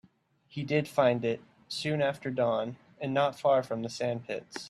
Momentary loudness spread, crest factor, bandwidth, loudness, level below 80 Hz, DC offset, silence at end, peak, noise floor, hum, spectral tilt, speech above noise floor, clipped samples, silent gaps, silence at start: 13 LU; 20 dB; 13.5 kHz; -30 LUFS; -72 dBFS; under 0.1%; 0 s; -12 dBFS; -65 dBFS; none; -6 dB/octave; 35 dB; under 0.1%; none; 0.55 s